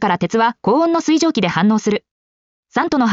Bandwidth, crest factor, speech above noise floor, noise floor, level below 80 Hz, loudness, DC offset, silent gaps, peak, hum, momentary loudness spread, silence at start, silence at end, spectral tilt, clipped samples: 7.6 kHz; 12 dB; over 75 dB; under -90 dBFS; -56 dBFS; -16 LUFS; under 0.1%; 2.11-2.63 s; -4 dBFS; none; 6 LU; 0 s; 0 s; -4.5 dB/octave; under 0.1%